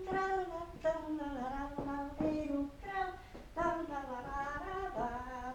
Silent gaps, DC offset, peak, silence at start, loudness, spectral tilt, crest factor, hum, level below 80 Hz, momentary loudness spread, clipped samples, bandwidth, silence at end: none; under 0.1%; -22 dBFS; 0 s; -39 LUFS; -6.5 dB/octave; 16 dB; none; -52 dBFS; 6 LU; under 0.1%; 18.5 kHz; 0 s